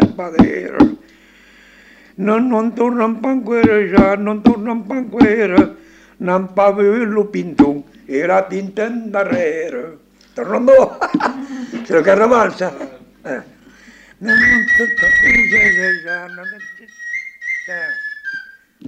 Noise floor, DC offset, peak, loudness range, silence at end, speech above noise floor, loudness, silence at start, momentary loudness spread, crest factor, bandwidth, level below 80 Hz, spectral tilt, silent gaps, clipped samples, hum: -46 dBFS; under 0.1%; -2 dBFS; 5 LU; 0 s; 32 dB; -14 LUFS; 0 s; 17 LU; 14 dB; 9.2 kHz; -42 dBFS; -6.5 dB/octave; none; under 0.1%; none